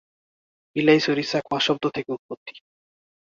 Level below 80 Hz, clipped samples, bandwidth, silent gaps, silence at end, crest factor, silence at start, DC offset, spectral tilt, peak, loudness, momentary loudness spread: -66 dBFS; under 0.1%; 7.6 kHz; 2.19-2.29 s, 2.37-2.46 s; 0.75 s; 20 dB; 0.75 s; under 0.1%; -5 dB/octave; -4 dBFS; -23 LUFS; 19 LU